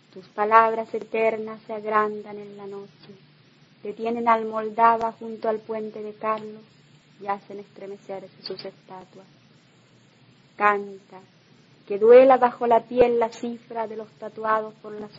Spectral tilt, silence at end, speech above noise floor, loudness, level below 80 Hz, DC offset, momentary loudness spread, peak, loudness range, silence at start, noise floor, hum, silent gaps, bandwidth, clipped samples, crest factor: -6 dB/octave; 0.1 s; 33 dB; -22 LUFS; -64 dBFS; under 0.1%; 21 LU; 0 dBFS; 17 LU; 0.15 s; -56 dBFS; none; none; 7.6 kHz; under 0.1%; 24 dB